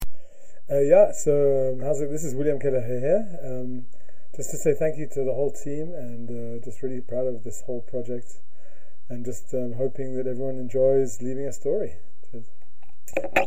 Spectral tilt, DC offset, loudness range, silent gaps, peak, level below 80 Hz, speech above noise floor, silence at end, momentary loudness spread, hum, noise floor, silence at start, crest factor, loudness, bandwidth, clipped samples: -6 dB/octave; 8%; 10 LU; none; -4 dBFS; -50 dBFS; 33 dB; 0 s; 16 LU; none; -58 dBFS; 0 s; 20 dB; -26 LUFS; 16 kHz; under 0.1%